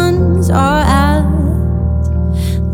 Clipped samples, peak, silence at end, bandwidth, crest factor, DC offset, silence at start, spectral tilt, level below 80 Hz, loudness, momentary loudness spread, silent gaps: under 0.1%; 0 dBFS; 0 s; 16 kHz; 12 dB; under 0.1%; 0 s; -7 dB/octave; -18 dBFS; -13 LUFS; 5 LU; none